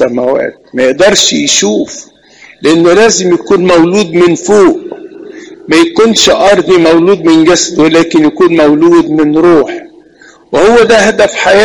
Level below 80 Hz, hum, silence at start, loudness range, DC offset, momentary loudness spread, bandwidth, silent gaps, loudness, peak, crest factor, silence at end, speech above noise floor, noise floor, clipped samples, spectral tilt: -40 dBFS; none; 0 s; 2 LU; under 0.1%; 10 LU; 11.5 kHz; none; -6 LUFS; 0 dBFS; 6 dB; 0 s; 33 dB; -39 dBFS; 0.4%; -3.5 dB/octave